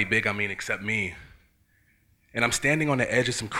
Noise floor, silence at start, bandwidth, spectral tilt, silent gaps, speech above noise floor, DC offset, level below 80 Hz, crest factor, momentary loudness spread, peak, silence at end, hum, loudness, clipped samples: -65 dBFS; 0 s; 16.5 kHz; -4 dB/octave; none; 38 dB; under 0.1%; -54 dBFS; 22 dB; 9 LU; -6 dBFS; 0 s; none; -25 LUFS; under 0.1%